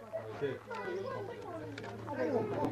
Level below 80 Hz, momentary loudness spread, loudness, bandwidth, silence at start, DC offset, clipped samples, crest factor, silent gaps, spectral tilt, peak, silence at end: -68 dBFS; 10 LU; -39 LUFS; 14 kHz; 0 s; under 0.1%; under 0.1%; 18 dB; none; -7 dB/octave; -20 dBFS; 0 s